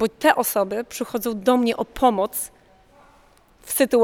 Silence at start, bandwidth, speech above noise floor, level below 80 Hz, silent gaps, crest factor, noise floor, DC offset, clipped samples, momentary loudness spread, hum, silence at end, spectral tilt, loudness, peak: 0 s; 20 kHz; 34 dB; -52 dBFS; none; 20 dB; -55 dBFS; under 0.1%; under 0.1%; 9 LU; none; 0 s; -3.5 dB/octave; -22 LUFS; -2 dBFS